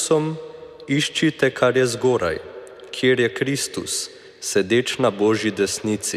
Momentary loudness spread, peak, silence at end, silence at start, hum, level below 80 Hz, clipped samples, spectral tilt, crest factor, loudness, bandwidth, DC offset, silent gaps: 15 LU; -4 dBFS; 0 s; 0 s; none; -58 dBFS; under 0.1%; -4 dB/octave; 18 dB; -21 LUFS; 15.5 kHz; under 0.1%; none